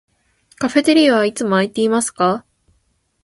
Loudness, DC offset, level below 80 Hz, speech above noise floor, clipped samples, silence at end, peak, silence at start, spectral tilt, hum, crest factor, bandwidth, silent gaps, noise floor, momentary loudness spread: -16 LUFS; under 0.1%; -60 dBFS; 49 dB; under 0.1%; 0.85 s; 0 dBFS; 0.6 s; -4 dB/octave; none; 16 dB; 11.5 kHz; none; -64 dBFS; 6 LU